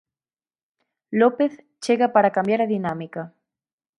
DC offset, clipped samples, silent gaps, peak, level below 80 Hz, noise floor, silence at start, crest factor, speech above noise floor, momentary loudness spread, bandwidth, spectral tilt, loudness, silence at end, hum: under 0.1%; under 0.1%; none; -4 dBFS; -70 dBFS; under -90 dBFS; 1.1 s; 20 dB; over 69 dB; 15 LU; 11.5 kHz; -6.5 dB/octave; -21 LUFS; 0.7 s; none